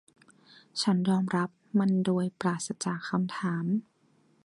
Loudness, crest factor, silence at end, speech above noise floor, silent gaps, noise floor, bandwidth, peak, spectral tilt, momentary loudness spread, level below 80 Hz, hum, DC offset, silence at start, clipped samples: -29 LUFS; 16 dB; 0.65 s; 38 dB; none; -66 dBFS; 11.5 kHz; -14 dBFS; -5.5 dB/octave; 6 LU; -74 dBFS; none; under 0.1%; 0.75 s; under 0.1%